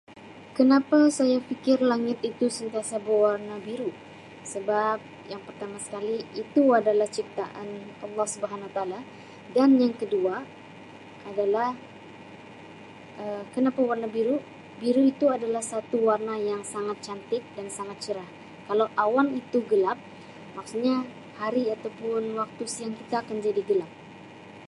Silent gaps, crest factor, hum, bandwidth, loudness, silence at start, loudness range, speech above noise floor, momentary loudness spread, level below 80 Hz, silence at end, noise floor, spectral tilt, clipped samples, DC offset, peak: none; 18 dB; none; 11.5 kHz; -26 LUFS; 0.1 s; 5 LU; 20 dB; 24 LU; -72 dBFS; 0 s; -46 dBFS; -5 dB/octave; under 0.1%; under 0.1%; -8 dBFS